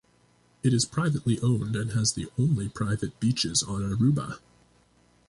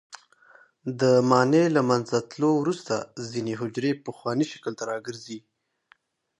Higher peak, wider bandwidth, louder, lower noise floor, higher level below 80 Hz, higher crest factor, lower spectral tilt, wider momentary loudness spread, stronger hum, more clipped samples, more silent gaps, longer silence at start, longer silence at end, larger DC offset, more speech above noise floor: second, -10 dBFS vs -6 dBFS; about the same, 11.5 kHz vs 11 kHz; about the same, -27 LUFS vs -25 LUFS; about the same, -63 dBFS vs -63 dBFS; first, -52 dBFS vs -70 dBFS; about the same, 16 dB vs 20 dB; about the same, -5 dB/octave vs -6 dB/octave; second, 5 LU vs 17 LU; first, 60 Hz at -45 dBFS vs none; neither; neither; first, 0.65 s vs 0.1 s; about the same, 0.9 s vs 1 s; neither; about the same, 37 dB vs 38 dB